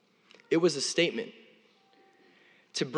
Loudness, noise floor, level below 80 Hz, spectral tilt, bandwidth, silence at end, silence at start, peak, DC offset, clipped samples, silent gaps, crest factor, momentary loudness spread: -29 LUFS; -63 dBFS; under -90 dBFS; -3.5 dB/octave; 11 kHz; 0 s; 0.5 s; -14 dBFS; under 0.1%; under 0.1%; none; 20 dB; 12 LU